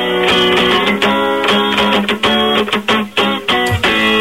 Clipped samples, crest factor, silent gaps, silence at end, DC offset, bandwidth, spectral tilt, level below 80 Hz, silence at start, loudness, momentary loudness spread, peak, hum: under 0.1%; 12 dB; none; 0 s; 0.5%; 16.5 kHz; -4 dB/octave; -40 dBFS; 0 s; -12 LUFS; 3 LU; -2 dBFS; none